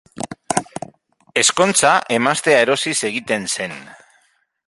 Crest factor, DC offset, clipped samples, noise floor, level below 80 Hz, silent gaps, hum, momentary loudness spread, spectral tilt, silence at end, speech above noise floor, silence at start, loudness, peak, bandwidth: 20 dB; under 0.1%; under 0.1%; -61 dBFS; -60 dBFS; none; none; 18 LU; -2 dB/octave; 0.75 s; 44 dB; 0.15 s; -17 LUFS; 0 dBFS; 11.5 kHz